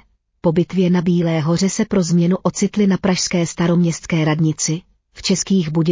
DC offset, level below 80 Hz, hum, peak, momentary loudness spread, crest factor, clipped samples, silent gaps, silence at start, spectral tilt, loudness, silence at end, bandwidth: under 0.1%; -48 dBFS; none; -4 dBFS; 4 LU; 14 dB; under 0.1%; none; 0.45 s; -5.5 dB/octave; -18 LUFS; 0 s; 7.6 kHz